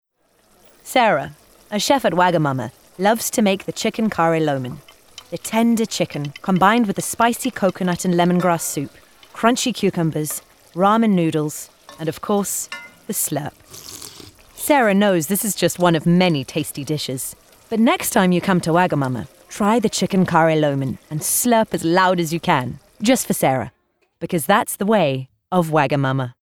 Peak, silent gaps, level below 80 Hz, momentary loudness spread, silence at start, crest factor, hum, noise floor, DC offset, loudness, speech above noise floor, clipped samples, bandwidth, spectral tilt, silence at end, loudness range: -2 dBFS; none; -56 dBFS; 14 LU; 0.85 s; 18 dB; none; -60 dBFS; under 0.1%; -19 LUFS; 41 dB; under 0.1%; 18 kHz; -4.5 dB/octave; 0.1 s; 3 LU